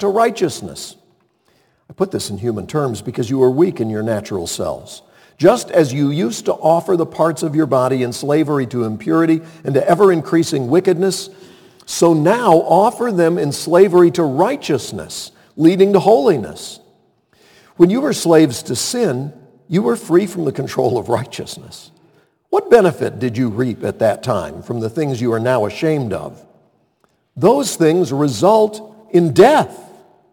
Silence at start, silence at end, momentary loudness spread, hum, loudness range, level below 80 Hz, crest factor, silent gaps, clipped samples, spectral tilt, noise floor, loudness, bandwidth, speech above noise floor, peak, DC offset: 0 s; 0.5 s; 13 LU; none; 5 LU; -56 dBFS; 16 dB; none; under 0.1%; -6 dB/octave; -61 dBFS; -16 LUFS; 18.5 kHz; 46 dB; 0 dBFS; under 0.1%